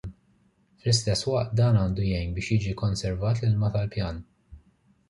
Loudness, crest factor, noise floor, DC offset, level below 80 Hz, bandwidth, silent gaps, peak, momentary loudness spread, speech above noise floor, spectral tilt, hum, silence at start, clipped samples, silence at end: -26 LUFS; 18 dB; -64 dBFS; under 0.1%; -42 dBFS; 11.5 kHz; none; -8 dBFS; 10 LU; 40 dB; -6 dB/octave; none; 0.05 s; under 0.1%; 0.5 s